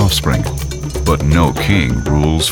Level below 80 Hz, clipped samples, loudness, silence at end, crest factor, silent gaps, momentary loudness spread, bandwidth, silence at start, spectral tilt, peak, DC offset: -22 dBFS; under 0.1%; -15 LUFS; 0 s; 14 dB; none; 7 LU; 19 kHz; 0 s; -5 dB/octave; 0 dBFS; under 0.1%